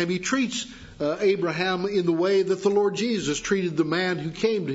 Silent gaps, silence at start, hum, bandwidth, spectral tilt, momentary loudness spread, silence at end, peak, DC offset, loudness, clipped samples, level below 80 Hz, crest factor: none; 0 s; none; 8 kHz; -4.5 dB/octave; 6 LU; 0 s; -10 dBFS; under 0.1%; -24 LUFS; under 0.1%; -56 dBFS; 14 dB